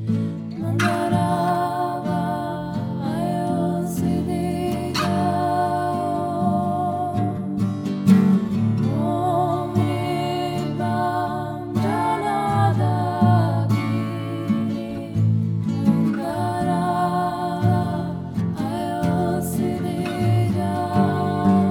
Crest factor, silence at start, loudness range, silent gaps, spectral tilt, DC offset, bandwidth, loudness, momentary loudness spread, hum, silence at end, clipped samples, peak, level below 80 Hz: 18 dB; 0 s; 3 LU; none; -7.5 dB/octave; under 0.1%; 16.5 kHz; -22 LUFS; 6 LU; none; 0 s; under 0.1%; -4 dBFS; -50 dBFS